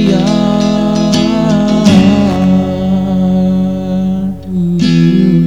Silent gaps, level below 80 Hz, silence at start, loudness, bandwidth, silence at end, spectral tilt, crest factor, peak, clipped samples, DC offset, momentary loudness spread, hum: none; -34 dBFS; 0 s; -11 LUFS; 10 kHz; 0 s; -7 dB/octave; 10 dB; 0 dBFS; 0.1%; 2%; 7 LU; none